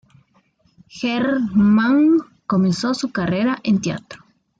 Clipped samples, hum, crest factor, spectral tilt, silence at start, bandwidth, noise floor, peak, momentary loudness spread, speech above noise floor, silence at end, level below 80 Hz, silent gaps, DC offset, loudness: under 0.1%; none; 12 dB; -6.5 dB/octave; 0.95 s; 9 kHz; -60 dBFS; -8 dBFS; 9 LU; 42 dB; 0.45 s; -54 dBFS; none; under 0.1%; -18 LUFS